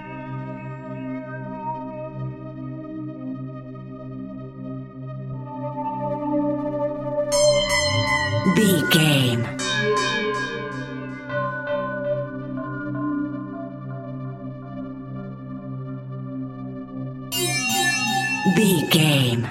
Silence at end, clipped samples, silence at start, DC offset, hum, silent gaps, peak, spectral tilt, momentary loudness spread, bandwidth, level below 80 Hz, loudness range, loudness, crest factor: 0 s; under 0.1%; 0 s; under 0.1%; none; none; -2 dBFS; -4.5 dB/octave; 16 LU; 16 kHz; -52 dBFS; 14 LU; -23 LUFS; 22 dB